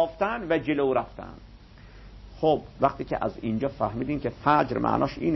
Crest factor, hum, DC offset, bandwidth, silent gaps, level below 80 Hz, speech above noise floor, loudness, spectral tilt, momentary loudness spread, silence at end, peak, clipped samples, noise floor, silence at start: 20 dB; none; under 0.1%; 6 kHz; none; -48 dBFS; 22 dB; -26 LUFS; -8.5 dB/octave; 7 LU; 0 s; -8 dBFS; under 0.1%; -48 dBFS; 0 s